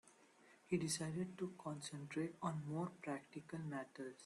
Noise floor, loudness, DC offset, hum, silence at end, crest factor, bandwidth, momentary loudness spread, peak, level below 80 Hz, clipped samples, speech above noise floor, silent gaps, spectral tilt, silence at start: -69 dBFS; -46 LUFS; under 0.1%; none; 0 s; 20 dB; 12 kHz; 8 LU; -28 dBFS; -80 dBFS; under 0.1%; 23 dB; none; -5 dB/octave; 0.05 s